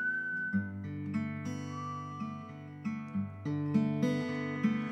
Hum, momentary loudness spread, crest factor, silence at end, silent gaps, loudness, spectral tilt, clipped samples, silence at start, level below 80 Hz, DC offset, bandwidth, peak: none; 10 LU; 18 dB; 0 s; none; -35 LUFS; -7 dB/octave; under 0.1%; 0 s; -78 dBFS; under 0.1%; 8.6 kHz; -16 dBFS